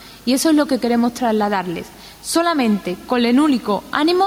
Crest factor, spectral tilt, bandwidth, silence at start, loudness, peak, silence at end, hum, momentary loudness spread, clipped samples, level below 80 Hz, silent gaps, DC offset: 18 dB; -4 dB/octave; 16.5 kHz; 0 s; -18 LUFS; 0 dBFS; 0 s; none; 8 LU; under 0.1%; -52 dBFS; none; under 0.1%